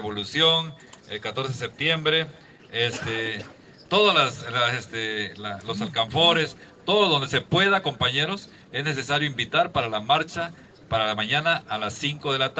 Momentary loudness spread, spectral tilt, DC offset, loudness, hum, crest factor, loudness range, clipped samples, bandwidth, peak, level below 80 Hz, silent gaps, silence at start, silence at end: 13 LU; -4 dB/octave; under 0.1%; -23 LUFS; none; 20 dB; 3 LU; under 0.1%; 8.8 kHz; -6 dBFS; -60 dBFS; none; 0 s; 0 s